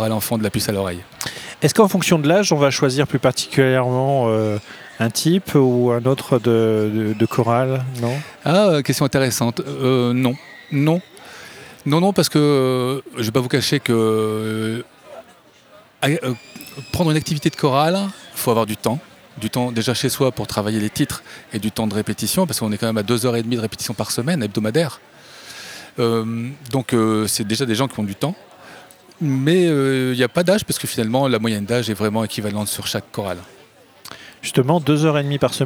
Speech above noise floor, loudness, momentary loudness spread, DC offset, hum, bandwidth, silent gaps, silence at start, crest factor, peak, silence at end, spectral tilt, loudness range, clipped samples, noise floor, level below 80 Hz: 31 dB; -19 LUFS; 12 LU; under 0.1%; none; over 20 kHz; none; 0 s; 18 dB; -2 dBFS; 0 s; -5 dB/octave; 4 LU; under 0.1%; -49 dBFS; -56 dBFS